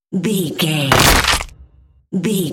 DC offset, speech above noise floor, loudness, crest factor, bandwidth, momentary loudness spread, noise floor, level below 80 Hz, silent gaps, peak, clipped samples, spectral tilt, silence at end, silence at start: under 0.1%; 33 dB; -15 LUFS; 16 dB; 17 kHz; 12 LU; -48 dBFS; -28 dBFS; none; 0 dBFS; under 0.1%; -3.5 dB/octave; 0 s; 0.1 s